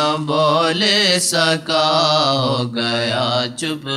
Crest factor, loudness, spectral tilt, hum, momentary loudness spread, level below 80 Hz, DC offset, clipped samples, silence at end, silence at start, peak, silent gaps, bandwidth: 14 dB; -16 LUFS; -3.5 dB/octave; none; 6 LU; -64 dBFS; under 0.1%; under 0.1%; 0 s; 0 s; -2 dBFS; none; 15.5 kHz